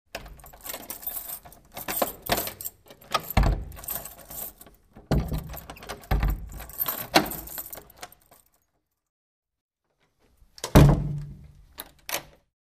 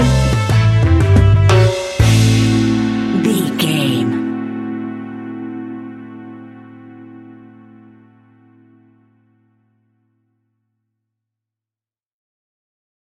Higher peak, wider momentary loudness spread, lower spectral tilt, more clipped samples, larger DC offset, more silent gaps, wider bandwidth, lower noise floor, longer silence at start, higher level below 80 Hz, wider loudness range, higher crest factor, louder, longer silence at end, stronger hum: about the same, -4 dBFS vs -2 dBFS; about the same, 19 LU vs 21 LU; about the same, -5 dB/octave vs -6 dB/octave; neither; neither; first, 9.09-9.42 s, 9.61-9.69 s vs none; first, 16 kHz vs 14 kHz; second, -76 dBFS vs under -90 dBFS; first, 0.15 s vs 0 s; second, -34 dBFS vs -28 dBFS; second, 6 LU vs 21 LU; first, 26 dB vs 16 dB; second, -27 LUFS vs -14 LUFS; second, 0.5 s vs 5.65 s; neither